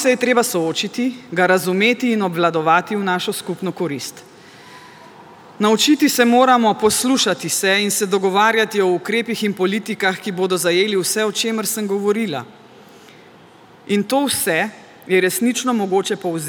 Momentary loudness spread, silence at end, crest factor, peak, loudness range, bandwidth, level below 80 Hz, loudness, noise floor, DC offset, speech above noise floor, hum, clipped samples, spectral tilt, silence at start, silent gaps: 8 LU; 0 s; 18 dB; 0 dBFS; 6 LU; over 20 kHz; -68 dBFS; -17 LUFS; -45 dBFS; under 0.1%; 28 dB; none; under 0.1%; -3.5 dB/octave; 0 s; none